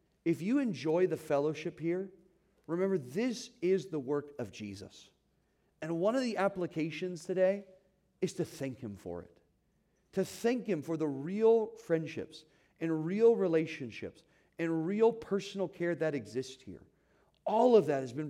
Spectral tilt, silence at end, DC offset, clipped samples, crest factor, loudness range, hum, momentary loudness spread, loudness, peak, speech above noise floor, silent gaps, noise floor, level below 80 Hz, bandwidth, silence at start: -6.5 dB/octave; 0 s; under 0.1%; under 0.1%; 20 dB; 6 LU; none; 16 LU; -33 LUFS; -14 dBFS; 42 dB; none; -74 dBFS; -76 dBFS; 15 kHz; 0.25 s